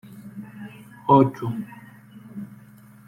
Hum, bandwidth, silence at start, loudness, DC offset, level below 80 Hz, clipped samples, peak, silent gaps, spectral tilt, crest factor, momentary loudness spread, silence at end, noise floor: none; 15.5 kHz; 0.05 s; -21 LUFS; under 0.1%; -60 dBFS; under 0.1%; -4 dBFS; none; -9 dB/octave; 22 dB; 24 LU; 0.55 s; -48 dBFS